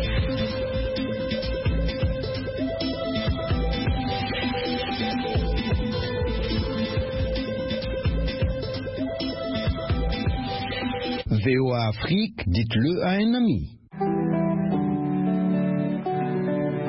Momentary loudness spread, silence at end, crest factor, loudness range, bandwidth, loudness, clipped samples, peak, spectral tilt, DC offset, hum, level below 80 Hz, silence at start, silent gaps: 6 LU; 0 s; 14 dB; 4 LU; 5.8 kHz; -26 LUFS; under 0.1%; -10 dBFS; -10.5 dB/octave; under 0.1%; none; -34 dBFS; 0 s; none